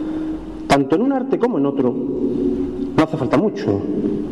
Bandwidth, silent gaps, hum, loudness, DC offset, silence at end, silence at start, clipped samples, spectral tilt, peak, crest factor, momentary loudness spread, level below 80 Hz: 12 kHz; none; none; -19 LUFS; 0.5%; 0 s; 0 s; under 0.1%; -7 dB/octave; -6 dBFS; 12 dB; 6 LU; -42 dBFS